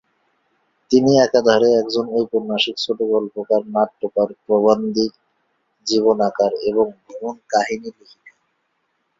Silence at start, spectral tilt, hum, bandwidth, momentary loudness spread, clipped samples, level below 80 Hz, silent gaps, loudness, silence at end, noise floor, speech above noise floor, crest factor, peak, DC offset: 0.9 s; -4.5 dB/octave; none; 7.6 kHz; 11 LU; under 0.1%; -60 dBFS; none; -18 LUFS; 0.9 s; -70 dBFS; 52 dB; 18 dB; -2 dBFS; under 0.1%